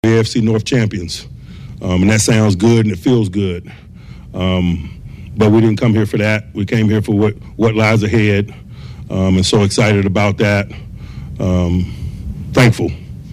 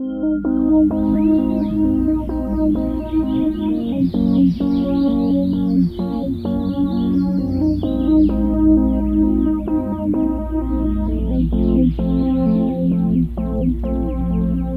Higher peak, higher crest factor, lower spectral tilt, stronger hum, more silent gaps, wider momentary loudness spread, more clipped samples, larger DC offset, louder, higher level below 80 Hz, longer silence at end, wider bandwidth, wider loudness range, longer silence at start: about the same, -2 dBFS vs -4 dBFS; about the same, 12 dB vs 12 dB; second, -6 dB/octave vs -10.5 dB/octave; neither; neither; first, 18 LU vs 6 LU; neither; neither; first, -14 LUFS vs -18 LUFS; second, -36 dBFS vs -26 dBFS; about the same, 0 s vs 0 s; first, 14 kHz vs 5.2 kHz; about the same, 2 LU vs 2 LU; about the same, 0.05 s vs 0 s